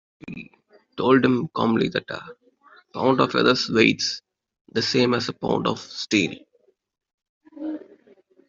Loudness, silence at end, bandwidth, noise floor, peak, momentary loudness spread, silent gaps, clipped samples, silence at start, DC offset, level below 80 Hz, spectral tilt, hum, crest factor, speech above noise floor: -22 LUFS; 0.65 s; 7.6 kHz; -65 dBFS; -2 dBFS; 19 LU; 4.61-4.65 s, 7.14-7.18 s, 7.29-7.41 s; under 0.1%; 0.25 s; under 0.1%; -62 dBFS; -5 dB/octave; none; 22 dB; 43 dB